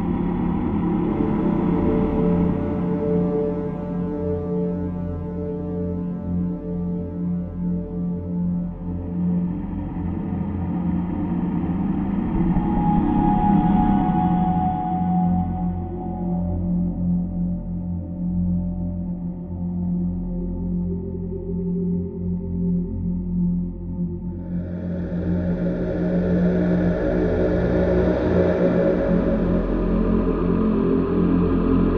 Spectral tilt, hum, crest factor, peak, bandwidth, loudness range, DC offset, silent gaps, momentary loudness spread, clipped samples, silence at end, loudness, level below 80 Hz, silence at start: -11.5 dB/octave; none; 16 dB; -6 dBFS; 4.1 kHz; 6 LU; under 0.1%; none; 9 LU; under 0.1%; 0 s; -23 LUFS; -34 dBFS; 0 s